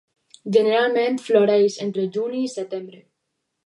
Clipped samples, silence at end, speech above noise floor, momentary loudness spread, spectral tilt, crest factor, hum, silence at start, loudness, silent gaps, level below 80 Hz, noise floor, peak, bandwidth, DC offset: under 0.1%; 0.7 s; 57 dB; 13 LU; -5 dB/octave; 18 dB; none; 0.45 s; -20 LUFS; none; -78 dBFS; -77 dBFS; -4 dBFS; 11 kHz; under 0.1%